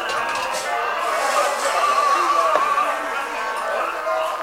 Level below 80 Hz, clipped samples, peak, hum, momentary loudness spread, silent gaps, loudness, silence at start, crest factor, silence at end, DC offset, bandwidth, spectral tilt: -58 dBFS; under 0.1%; -4 dBFS; none; 7 LU; none; -20 LUFS; 0 s; 18 dB; 0 s; under 0.1%; 16 kHz; -0.5 dB/octave